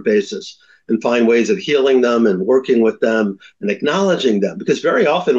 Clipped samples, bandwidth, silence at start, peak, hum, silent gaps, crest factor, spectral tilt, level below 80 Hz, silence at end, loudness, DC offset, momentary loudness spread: under 0.1%; 7.8 kHz; 0 s; -4 dBFS; none; none; 12 dB; -5.5 dB/octave; -64 dBFS; 0 s; -16 LUFS; under 0.1%; 9 LU